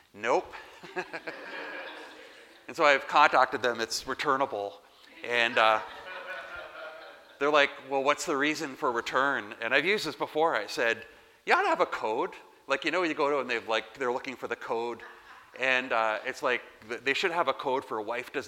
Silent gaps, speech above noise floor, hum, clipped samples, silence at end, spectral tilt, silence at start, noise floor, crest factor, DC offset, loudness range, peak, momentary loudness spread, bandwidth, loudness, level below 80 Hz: none; 23 dB; none; under 0.1%; 0 s; -2.5 dB/octave; 0.15 s; -52 dBFS; 24 dB; under 0.1%; 4 LU; -6 dBFS; 17 LU; 16.5 kHz; -28 LUFS; -70 dBFS